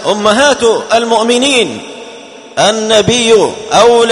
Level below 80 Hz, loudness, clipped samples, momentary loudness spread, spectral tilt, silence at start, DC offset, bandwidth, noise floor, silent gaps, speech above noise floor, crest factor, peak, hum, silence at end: -46 dBFS; -9 LUFS; 0.4%; 15 LU; -3 dB/octave; 0 s; under 0.1%; 11 kHz; -31 dBFS; none; 22 dB; 10 dB; 0 dBFS; none; 0 s